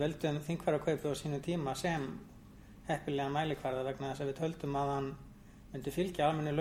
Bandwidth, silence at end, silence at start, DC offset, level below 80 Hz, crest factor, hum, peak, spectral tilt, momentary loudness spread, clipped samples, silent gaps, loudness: 16.5 kHz; 0 s; 0 s; under 0.1%; -58 dBFS; 18 dB; none; -18 dBFS; -6 dB/octave; 16 LU; under 0.1%; none; -36 LUFS